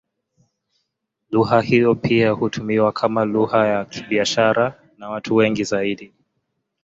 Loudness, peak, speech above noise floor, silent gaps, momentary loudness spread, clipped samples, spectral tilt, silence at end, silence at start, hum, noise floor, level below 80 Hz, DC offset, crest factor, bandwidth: -19 LUFS; -2 dBFS; 58 dB; none; 8 LU; under 0.1%; -5.5 dB/octave; 0.75 s; 1.3 s; none; -76 dBFS; -56 dBFS; under 0.1%; 18 dB; 7.8 kHz